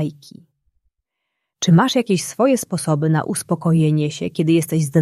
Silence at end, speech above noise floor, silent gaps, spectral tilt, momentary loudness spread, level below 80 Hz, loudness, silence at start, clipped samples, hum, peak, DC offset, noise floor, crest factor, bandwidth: 0 s; 60 dB; none; -6 dB/octave; 7 LU; -60 dBFS; -18 LUFS; 0 s; under 0.1%; none; -4 dBFS; under 0.1%; -78 dBFS; 16 dB; 15 kHz